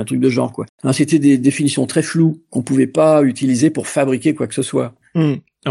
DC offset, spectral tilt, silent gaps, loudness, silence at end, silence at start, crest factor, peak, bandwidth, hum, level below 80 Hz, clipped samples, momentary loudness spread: under 0.1%; -6 dB/octave; 0.69-0.78 s; -16 LUFS; 0 s; 0 s; 14 dB; 0 dBFS; 12.5 kHz; none; -62 dBFS; under 0.1%; 9 LU